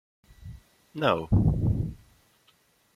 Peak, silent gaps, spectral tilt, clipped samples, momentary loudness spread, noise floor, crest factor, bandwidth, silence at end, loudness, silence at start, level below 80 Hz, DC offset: -8 dBFS; none; -8.5 dB/octave; under 0.1%; 24 LU; -65 dBFS; 20 dB; 10 kHz; 1 s; -26 LUFS; 0.4 s; -40 dBFS; under 0.1%